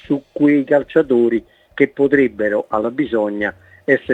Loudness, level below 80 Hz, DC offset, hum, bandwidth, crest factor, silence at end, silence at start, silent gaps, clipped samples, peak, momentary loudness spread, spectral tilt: -17 LUFS; -54 dBFS; under 0.1%; none; 4.2 kHz; 16 dB; 0 s; 0.1 s; none; under 0.1%; 0 dBFS; 9 LU; -8.5 dB/octave